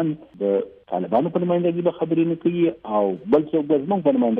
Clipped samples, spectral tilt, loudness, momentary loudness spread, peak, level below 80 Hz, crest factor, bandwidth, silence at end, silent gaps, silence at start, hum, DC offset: under 0.1%; -11 dB/octave; -22 LUFS; 6 LU; -6 dBFS; -62 dBFS; 14 dB; 3.8 kHz; 0 s; none; 0 s; none; under 0.1%